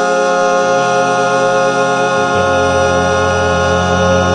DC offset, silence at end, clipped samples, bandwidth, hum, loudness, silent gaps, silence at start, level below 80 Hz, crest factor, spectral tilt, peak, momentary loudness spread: 0.1%; 0 s; under 0.1%; 10 kHz; none; -12 LUFS; none; 0 s; -38 dBFS; 12 dB; -4.5 dB/octave; 0 dBFS; 1 LU